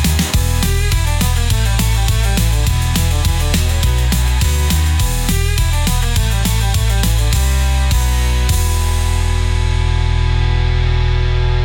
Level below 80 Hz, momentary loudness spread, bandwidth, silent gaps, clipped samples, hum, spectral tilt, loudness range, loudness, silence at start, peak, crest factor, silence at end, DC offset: -16 dBFS; 2 LU; 18 kHz; none; under 0.1%; none; -4.5 dB/octave; 1 LU; -16 LUFS; 0 s; -4 dBFS; 10 dB; 0 s; under 0.1%